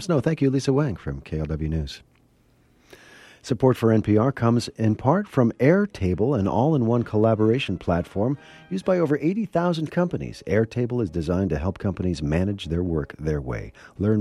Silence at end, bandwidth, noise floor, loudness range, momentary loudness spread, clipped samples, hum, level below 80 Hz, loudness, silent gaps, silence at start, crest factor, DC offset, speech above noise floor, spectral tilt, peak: 0 s; 12.5 kHz; -60 dBFS; 5 LU; 10 LU; under 0.1%; none; -42 dBFS; -23 LUFS; none; 0 s; 18 dB; under 0.1%; 37 dB; -7.5 dB/octave; -4 dBFS